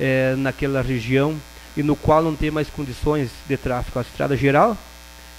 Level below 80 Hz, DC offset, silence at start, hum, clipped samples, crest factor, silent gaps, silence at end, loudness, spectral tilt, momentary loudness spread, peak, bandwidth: -36 dBFS; under 0.1%; 0 s; none; under 0.1%; 18 dB; none; 0 s; -21 LUFS; -7 dB/octave; 11 LU; -2 dBFS; 16 kHz